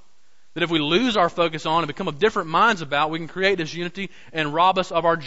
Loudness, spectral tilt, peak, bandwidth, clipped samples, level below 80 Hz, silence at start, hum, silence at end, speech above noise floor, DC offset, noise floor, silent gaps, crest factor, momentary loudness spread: -21 LUFS; -5 dB/octave; -6 dBFS; 8 kHz; under 0.1%; -54 dBFS; 0.55 s; none; 0 s; 43 dB; 0.9%; -64 dBFS; none; 16 dB; 10 LU